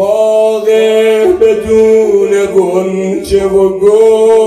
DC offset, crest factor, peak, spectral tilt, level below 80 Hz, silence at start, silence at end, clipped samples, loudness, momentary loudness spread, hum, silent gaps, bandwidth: under 0.1%; 8 dB; 0 dBFS; -5.5 dB/octave; -38 dBFS; 0 s; 0 s; 0.8%; -9 LUFS; 6 LU; none; none; 13 kHz